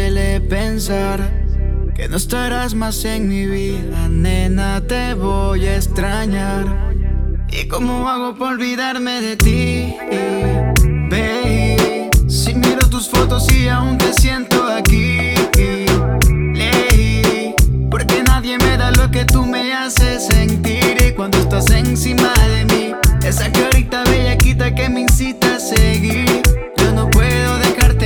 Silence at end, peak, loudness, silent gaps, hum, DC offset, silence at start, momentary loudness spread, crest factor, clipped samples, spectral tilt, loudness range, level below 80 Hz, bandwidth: 0 s; -2 dBFS; -15 LUFS; none; none; under 0.1%; 0 s; 7 LU; 12 dB; under 0.1%; -5 dB/octave; 5 LU; -18 dBFS; over 20 kHz